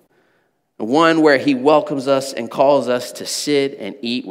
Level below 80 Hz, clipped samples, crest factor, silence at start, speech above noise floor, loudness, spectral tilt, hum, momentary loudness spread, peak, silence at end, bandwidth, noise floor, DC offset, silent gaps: -76 dBFS; under 0.1%; 18 dB; 0.8 s; 47 dB; -17 LUFS; -4 dB/octave; none; 11 LU; 0 dBFS; 0 s; 16 kHz; -64 dBFS; under 0.1%; none